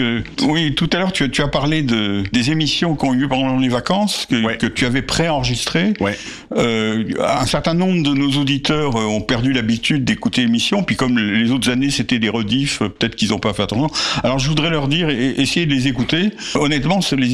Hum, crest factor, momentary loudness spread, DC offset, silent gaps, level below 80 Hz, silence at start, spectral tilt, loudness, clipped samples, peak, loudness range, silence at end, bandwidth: none; 12 dB; 3 LU; under 0.1%; none; -38 dBFS; 0 s; -5 dB/octave; -17 LUFS; under 0.1%; -4 dBFS; 1 LU; 0 s; 14 kHz